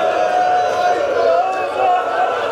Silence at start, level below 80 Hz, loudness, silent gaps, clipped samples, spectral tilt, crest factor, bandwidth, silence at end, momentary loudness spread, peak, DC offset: 0 s; -58 dBFS; -16 LUFS; none; under 0.1%; -3 dB/octave; 12 dB; 11 kHz; 0 s; 3 LU; -2 dBFS; under 0.1%